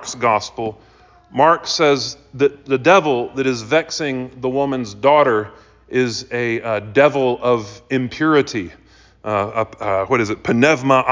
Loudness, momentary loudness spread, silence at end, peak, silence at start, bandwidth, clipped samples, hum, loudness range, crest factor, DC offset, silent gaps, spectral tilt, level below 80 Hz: -18 LUFS; 10 LU; 0 s; -2 dBFS; 0 s; 7.6 kHz; under 0.1%; none; 2 LU; 16 dB; under 0.1%; none; -5 dB/octave; -52 dBFS